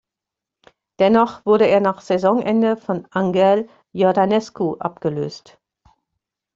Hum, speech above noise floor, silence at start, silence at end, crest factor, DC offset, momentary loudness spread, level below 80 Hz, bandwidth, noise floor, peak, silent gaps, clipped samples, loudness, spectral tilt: none; 68 dB; 1 s; 1.15 s; 16 dB; under 0.1%; 9 LU; -60 dBFS; 7.6 kHz; -86 dBFS; -2 dBFS; none; under 0.1%; -18 LUFS; -7 dB/octave